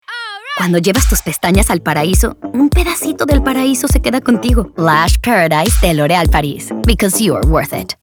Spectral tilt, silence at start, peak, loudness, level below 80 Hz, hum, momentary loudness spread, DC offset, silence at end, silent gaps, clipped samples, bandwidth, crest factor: -4.5 dB/octave; 0.1 s; 0 dBFS; -13 LUFS; -18 dBFS; none; 5 LU; under 0.1%; 0.1 s; none; under 0.1%; over 20 kHz; 12 dB